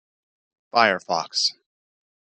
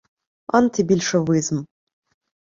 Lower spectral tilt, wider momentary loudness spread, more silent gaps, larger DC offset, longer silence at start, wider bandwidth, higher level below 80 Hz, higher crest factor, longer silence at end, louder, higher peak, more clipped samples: second, -1.5 dB/octave vs -5.5 dB/octave; about the same, 6 LU vs 6 LU; neither; neither; first, 0.75 s vs 0.55 s; first, 11 kHz vs 7.6 kHz; second, -78 dBFS vs -58 dBFS; about the same, 24 dB vs 20 dB; about the same, 0.85 s vs 0.9 s; about the same, -22 LUFS vs -20 LUFS; about the same, -2 dBFS vs -2 dBFS; neither